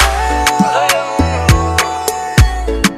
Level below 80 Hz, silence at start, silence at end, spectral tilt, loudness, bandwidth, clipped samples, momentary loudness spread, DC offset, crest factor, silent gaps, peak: -18 dBFS; 0 s; 0 s; -4 dB/octave; -13 LUFS; 14.5 kHz; under 0.1%; 3 LU; under 0.1%; 12 dB; none; 0 dBFS